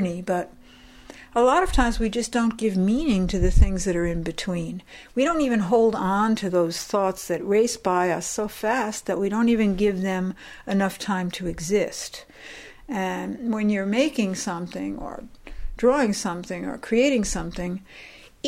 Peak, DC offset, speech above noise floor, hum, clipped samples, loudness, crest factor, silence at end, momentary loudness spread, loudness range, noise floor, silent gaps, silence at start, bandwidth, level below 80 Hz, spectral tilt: -6 dBFS; under 0.1%; 25 dB; none; under 0.1%; -24 LUFS; 18 dB; 0 s; 15 LU; 4 LU; -48 dBFS; none; 0 s; 16 kHz; -32 dBFS; -5.5 dB/octave